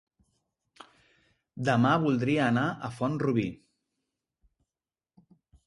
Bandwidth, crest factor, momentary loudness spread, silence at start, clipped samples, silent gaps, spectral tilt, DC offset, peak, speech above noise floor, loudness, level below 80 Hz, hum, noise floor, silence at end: 11.5 kHz; 20 dB; 9 LU; 1.55 s; under 0.1%; none; -7 dB/octave; under 0.1%; -12 dBFS; over 63 dB; -27 LUFS; -64 dBFS; none; under -90 dBFS; 2.1 s